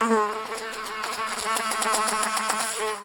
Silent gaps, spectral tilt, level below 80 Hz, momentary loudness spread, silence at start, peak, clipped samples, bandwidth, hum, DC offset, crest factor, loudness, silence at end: none; -1 dB/octave; -60 dBFS; 8 LU; 0 s; -6 dBFS; under 0.1%; 19.5 kHz; none; under 0.1%; 20 dB; -25 LUFS; 0 s